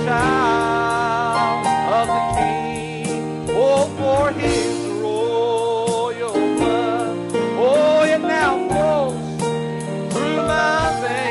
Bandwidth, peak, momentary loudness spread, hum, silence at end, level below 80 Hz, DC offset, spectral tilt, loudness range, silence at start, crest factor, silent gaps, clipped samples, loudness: 11.5 kHz; -6 dBFS; 7 LU; none; 0 s; -44 dBFS; under 0.1%; -5 dB/octave; 2 LU; 0 s; 12 dB; none; under 0.1%; -19 LUFS